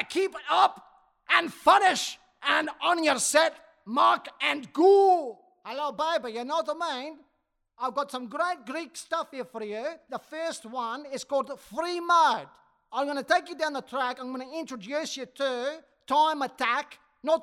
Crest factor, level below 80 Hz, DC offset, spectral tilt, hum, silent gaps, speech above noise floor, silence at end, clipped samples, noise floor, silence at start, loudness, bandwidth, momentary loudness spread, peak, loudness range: 20 dB; -76 dBFS; under 0.1%; -1.5 dB/octave; none; none; 49 dB; 0 s; under 0.1%; -76 dBFS; 0 s; -27 LUFS; 16 kHz; 14 LU; -6 dBFS; 9 LU